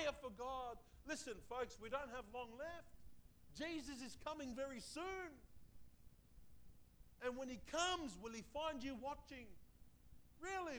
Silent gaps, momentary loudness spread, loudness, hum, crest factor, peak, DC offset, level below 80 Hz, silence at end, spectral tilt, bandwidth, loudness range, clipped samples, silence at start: none; 12 LU; -49 LUFS; none; 22 dB; -28 dBFS; under 0.1%; -66 dBFS; 0 s; -3 dB/octave; over 20 kHz; 5 LU; under 0.1%; 0 s